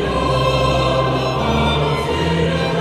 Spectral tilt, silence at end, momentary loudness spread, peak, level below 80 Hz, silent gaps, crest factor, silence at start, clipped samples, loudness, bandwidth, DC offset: -6 dB/octave; 0 s; 2 LU; -4 dBFS; -28 dBFS; none; 12 dB; 0 s; under 0.1%; -17 LUFS; 14 kHz; 0.1%